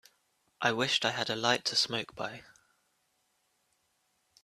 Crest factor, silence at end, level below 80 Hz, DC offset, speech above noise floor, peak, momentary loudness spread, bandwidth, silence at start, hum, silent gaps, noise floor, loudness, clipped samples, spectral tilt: 26 dB; 2 s; -74 dBFS; under 0.1%; 44 dB; -10 dBFS; 13 LU; 14 kHz; 0.6 s; none; none; -76 dBFS; -30 LUFS; under 0.1%; -2.5 dB/octave